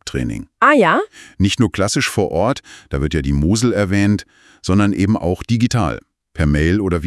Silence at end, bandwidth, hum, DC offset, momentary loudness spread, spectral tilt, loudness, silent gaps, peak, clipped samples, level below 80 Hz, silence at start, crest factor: 0 s; 12 kHz; none; under 0.1%; 11 LU; -5.5 dB/octave; -17 LUFS; none; 0 dBFS; under 0.1%; -32 dBFS; 0.05 s; 16 dB